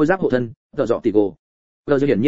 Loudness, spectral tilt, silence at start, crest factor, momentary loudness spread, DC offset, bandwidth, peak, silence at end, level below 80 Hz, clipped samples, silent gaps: -20 LUFS; -8 dB/octave; 0 s; 16 dB; 9 LU; under 0.1%; 7.8 kHz; -2 dBFS; 0 s; -52 dBFS; under 0.1%; 0.56-0.70 s, 1.39-1.84 s